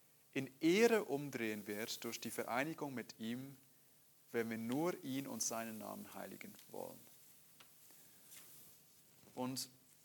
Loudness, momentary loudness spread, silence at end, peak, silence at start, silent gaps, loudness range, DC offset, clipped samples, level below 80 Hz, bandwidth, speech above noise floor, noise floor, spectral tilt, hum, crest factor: -41 LUFS; 23 LU; 0.3 s; -18 dBFS; 0.35 s; none; 14 LU; under 0.1%; under 0.1%; -90 dBFS; 19 kHz; 28 dB; -69 dBFS; -4 dB/octave; none; 24 dB